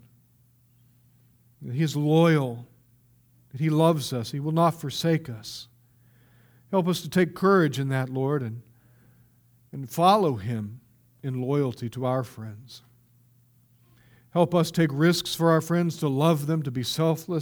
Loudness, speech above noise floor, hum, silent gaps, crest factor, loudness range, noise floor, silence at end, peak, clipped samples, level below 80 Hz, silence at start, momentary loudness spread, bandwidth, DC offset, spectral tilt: -25 LUFS; 37 dB; none; none; 20 dB; 6 LU; -61 dBFS; 0 s; -6 dBFS; under 0.1%; -66 dBFS; 1.6 s; 17 LU; over 20 kHz; under 0.1%; -6.5 dB/octave